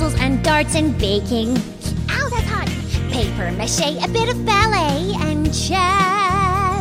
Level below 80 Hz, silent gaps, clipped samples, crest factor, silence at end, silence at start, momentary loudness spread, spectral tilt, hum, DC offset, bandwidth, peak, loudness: -28 dBFS; none; under 0.1%; 16 dB; 0 s; 0 s; 7 LU; -4.5 dB/octave; none; under 0.1%; 16 kHz; -2 dBFS; -18 LUFS